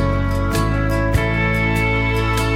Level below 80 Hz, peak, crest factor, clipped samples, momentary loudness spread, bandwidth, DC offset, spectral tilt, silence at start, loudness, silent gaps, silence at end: -24 dBFS; -4 dBFS; 14 dB; under 0.1%; 2 LU; 16.5 kHz; under 0.1%; -6 dB/octave; 0 s; -18 LUFS; none; 0 s